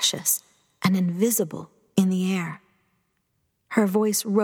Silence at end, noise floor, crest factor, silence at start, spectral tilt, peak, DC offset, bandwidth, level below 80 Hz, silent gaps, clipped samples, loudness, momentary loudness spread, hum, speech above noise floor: 0 s; -73 dBFS; 20 dB; 0 s; -4 dB/octave; -6 dBFS; under 0.1%; 18.5 kHz; -74 dBFS; none; under 0.1%; -24 LUFS; 9 LU; none; 50 dB